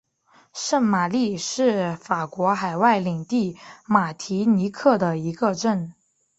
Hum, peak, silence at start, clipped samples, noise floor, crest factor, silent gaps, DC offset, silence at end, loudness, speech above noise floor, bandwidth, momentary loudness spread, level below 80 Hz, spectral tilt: none; -4 dBFS; 0.55 s; under 0.1%; -58 dBFS; 20 dB; none; under 0.1%; 0.5 s; -22 LUFS; 37 dB; 8.2 kHz; 8 LU; -64 dBFS; -5.5 dB/octave